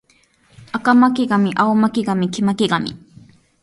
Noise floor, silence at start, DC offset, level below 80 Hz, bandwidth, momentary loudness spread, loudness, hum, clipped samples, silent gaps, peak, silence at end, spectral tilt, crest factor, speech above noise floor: -57 dBFS; 0.6 s; under 0.1%; -58 dBFS; 11.5 kHz; 8 LU; -17 LUFS; none; under 0.1%; none; -2 dBFS; 0.65 s; -6 dB/octave; 16 dB; 41 dB